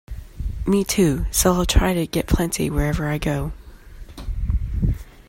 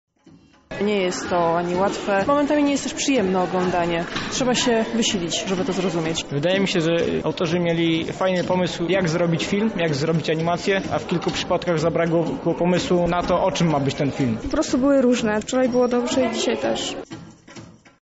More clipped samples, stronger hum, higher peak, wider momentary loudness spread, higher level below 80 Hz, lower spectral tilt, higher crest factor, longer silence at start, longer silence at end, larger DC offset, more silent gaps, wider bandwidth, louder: neither; neither; first, -2 dBFS vs -8 dBFS; first, 15 LU vs 4 LU; first, -28 dBFS vs -46 dBFS; about the same, -5 dB/octave vs -4.5 dB/octave; first, 20 dB vs 12 dB; second, 0.1 s vs 0.7 s; second, 0.05 s vs 0.35 s; neither; neither; first, 16.5 kHz vs 8 kHz; about the same, -21 LUFS vs -21 LUFS